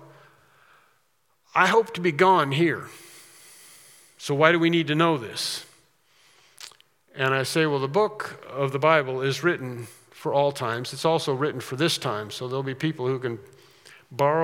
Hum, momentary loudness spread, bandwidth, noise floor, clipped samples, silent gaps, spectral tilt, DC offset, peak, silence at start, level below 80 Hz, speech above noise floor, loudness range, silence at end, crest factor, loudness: none; 18 LU; 18 kHz; -69 dBFS; under 0.1%; none; -5 dB/octave; under 0.1%; 0 dBFS; 1.55 s; -78 dBFS; 46 dB; 4 LU; 0 s; 24 dB; -24 LUFS